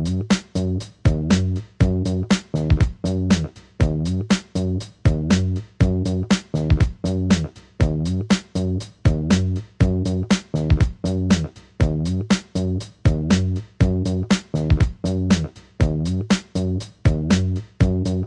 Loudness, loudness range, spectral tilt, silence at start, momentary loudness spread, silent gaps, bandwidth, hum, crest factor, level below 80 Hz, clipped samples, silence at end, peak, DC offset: -21 LUFS; 1 LU; -6.5 dB/octave; 0 s; 5 LU; none; 11 kHz; none; 16 dB; -30 dBFS; under 0.1%; 0 s; -4 dBFS; under 0.1%